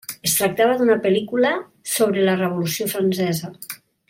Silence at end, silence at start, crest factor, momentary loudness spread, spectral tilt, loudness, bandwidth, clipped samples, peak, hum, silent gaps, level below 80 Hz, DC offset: 0.35 s; 0.1 s; 16 dB; 10 LU; -4 dB/octave; -20 LUFS; 16.5 kHz; under 0.1%; -4 dBFS; none; none; -62 dBFS; under 0.1%